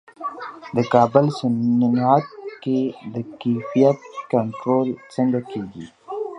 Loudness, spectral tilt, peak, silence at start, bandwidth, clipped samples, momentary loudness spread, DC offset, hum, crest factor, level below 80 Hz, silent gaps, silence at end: -21 LUFS; -8 dB/octave; 0 dBFS; 0.2 s; 9.4 kHz; under 0.1%; 14 LU; under 0.1%; none; 20 dB; -64 dBFS; none; 0 s